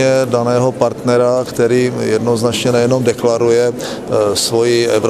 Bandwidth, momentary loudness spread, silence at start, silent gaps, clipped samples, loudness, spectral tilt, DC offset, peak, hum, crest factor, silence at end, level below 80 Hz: 15 kHz; 3 LU; 0 s; none; under 0.1%; -14 LUFS; -5 dB/octave; under 0.1%; 0 dBFS; none; 14 dB; 0 s; -48 dBFS